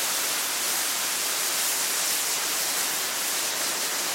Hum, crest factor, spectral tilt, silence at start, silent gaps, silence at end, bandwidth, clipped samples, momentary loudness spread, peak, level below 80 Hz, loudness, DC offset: none; 14 dB; 1.5 dB/octave; 0 s; none; 0 s; 16.5 kHz; under 0.1%; 2 LU; -12 dBFS; -76 dBFS; -24 LUFS; under 0.1%